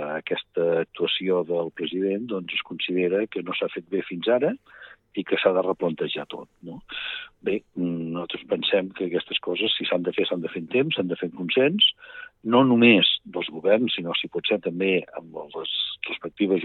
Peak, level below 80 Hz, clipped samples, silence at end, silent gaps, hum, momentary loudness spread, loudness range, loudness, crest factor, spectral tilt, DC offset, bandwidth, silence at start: -4 dBFS; -68 dBFS; under 0.1%; 0 s; none; none; 13 LU; 7 LU; -24 LUFS; 22 dB; -8 dB/octave; under 0.1%; 4.4 kHz; 0 s